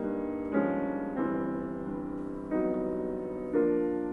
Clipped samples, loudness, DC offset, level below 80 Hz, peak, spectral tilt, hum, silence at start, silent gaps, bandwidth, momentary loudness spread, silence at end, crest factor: under 0.1%; -32 LUFS; under 0.1%; -56 dBFS; -14 dBFS; -10 dB/octave; none; 0 s; none; 3.7 kHz; 8 LU; 0 s; 16 dB